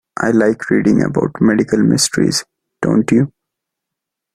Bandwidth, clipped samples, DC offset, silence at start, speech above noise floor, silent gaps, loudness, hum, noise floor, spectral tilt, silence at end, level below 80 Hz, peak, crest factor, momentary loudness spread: 14 kHz; under 0.1%; under 0.1%; 0.15 s; 67 dB; none; -15 LUFS; none; -81 dBFS; -5 dB/octave; 1.05 s; -48 dBFS; -2 dBFS; 14 dB; 4 LU